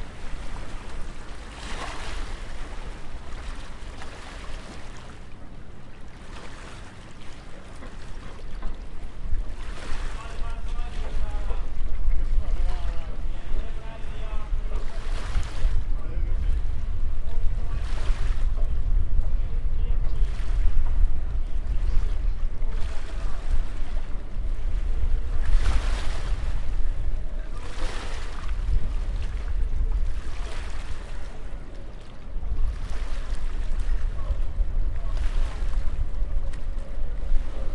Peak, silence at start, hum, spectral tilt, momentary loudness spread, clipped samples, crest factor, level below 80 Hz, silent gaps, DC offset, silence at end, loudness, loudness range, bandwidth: -6 dBFS; 0 s; none; -5.5 dB/octave; 12 LU; under 0.1%; 16 dB; -26 dBFS; none; under 0.1%; 0 s; -33 LUFS; 11 LU; 7.2 kHz